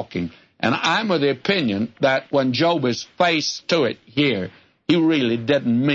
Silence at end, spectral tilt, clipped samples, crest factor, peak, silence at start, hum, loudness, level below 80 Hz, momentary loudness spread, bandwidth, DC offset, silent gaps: 0 s; -5 dB/octave; under 0.1%; 16 dB; -4 dBFS; 0 s; none; -20 LUFS; -62 dBFS; 8 LU; 7.8 kHz; under 0.1%; none